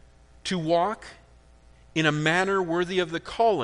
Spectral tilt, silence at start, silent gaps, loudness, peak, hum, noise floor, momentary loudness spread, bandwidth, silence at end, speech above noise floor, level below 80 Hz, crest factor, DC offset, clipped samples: -5 dB/octave; 0.45 s; none; -25 LUFS; -6 dBFS; none; -54 dBFS; 11 LU; 10.5 kHz; 0 s; 29 dB; -54 dBFS; 20 dB; under 0.1%; under 0.1%